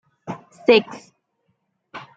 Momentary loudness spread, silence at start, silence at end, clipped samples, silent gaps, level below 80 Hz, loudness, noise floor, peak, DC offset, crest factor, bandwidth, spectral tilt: 24 LU; 0.25 s; 0.2 s; under 0.1%; none; -68 dBFS; -18 LUFS; -71 dBFS; -2 dBFS; under 0.1%; 22 dB; 7.8 kHz; -5 dB/octave